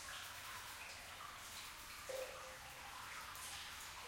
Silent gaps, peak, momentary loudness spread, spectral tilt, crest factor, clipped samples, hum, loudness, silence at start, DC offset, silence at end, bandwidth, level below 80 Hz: none; -36 dBFS; 4 LU; -1 dB/octave; 16 dB; under 0.1%; none; -50 LUFS; 0 s; under 0.1%; 0 s; 16.5 kHz; -70 dBFS